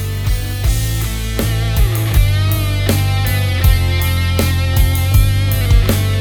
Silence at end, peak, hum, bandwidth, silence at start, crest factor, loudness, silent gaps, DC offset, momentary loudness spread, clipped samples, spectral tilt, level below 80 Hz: 0 s; 0 dBFS; none; over 20 kHz; 0 s; 12 dB; -15 LUFS; none; under 0.1%; 5 LU; under 0.1%; -5 dB/octave; -18 dBFS